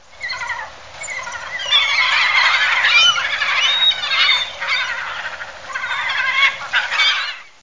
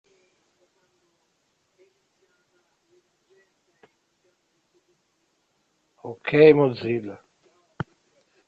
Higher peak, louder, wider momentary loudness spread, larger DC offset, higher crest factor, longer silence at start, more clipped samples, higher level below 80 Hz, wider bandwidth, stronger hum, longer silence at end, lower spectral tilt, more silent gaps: about the same, -2 dBFS vs -4 dBFS; first, -15 LUFS vs -20 LUFS; second, 14 LU vs 25 LU; first, 0.6% vs under 0.1%; second, 16 dB vs 24 dB; second, 0.2 s vs 6.05 s; neither; first, -56 dBFS vs -68 dBFS; first, 7.8 kHz vs 5 kHz; neither; second, 0.2 s vs 1.35 s; second, 2 dB/octave vs -8.5 dB/octave; neither